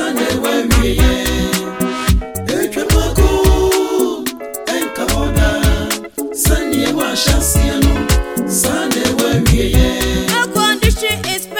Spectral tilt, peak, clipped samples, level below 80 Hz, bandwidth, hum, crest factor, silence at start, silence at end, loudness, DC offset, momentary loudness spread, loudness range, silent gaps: -4.5 dB/octave; 0 dBFS; under 0.1%; -18 dBFS; 17 kHz; none; 14 dB; 0 s; 0 s; -15 LUFS; 0.4%; 6 LU; 2 LU; none